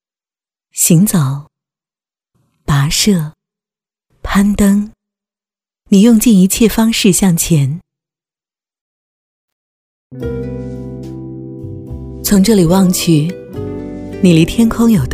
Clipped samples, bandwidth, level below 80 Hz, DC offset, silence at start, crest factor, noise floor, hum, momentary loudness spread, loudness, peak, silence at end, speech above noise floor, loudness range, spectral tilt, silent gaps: under 0.1%; 16 kHz; -34 dBFS; under 0.1%; 0.75 s; 14 dB; under -90 dBFS; none; 18 LU; -11 LUFS; 0 dBFS; 0 s; over 80 dB; 16 LU; -5 dB/octave; 8.81-10.10 s